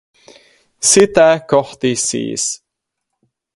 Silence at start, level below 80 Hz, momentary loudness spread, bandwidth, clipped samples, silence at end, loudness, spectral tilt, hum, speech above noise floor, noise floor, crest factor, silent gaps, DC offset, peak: 0.8 s; -54 dBFS; 10 LU; 11.5 kHz; under 0.1%; 1 s; -14 LUFS; -3 dB/octave; none; 64 dB; -78 dBFS; 16 dB; none; under 0.1%; 0 dBFS